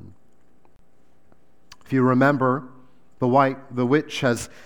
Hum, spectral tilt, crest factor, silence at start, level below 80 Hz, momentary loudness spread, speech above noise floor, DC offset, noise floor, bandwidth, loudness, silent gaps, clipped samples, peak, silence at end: none; -6.5 dB/octave; 20 dB; 0.05 s; -62 dBFS; 8 LU; 42 dB; 0.5%; -62 dBFS; 17 kHz; -21 LUFS; none; under 0.1%; -4 dBFS; 0.2 s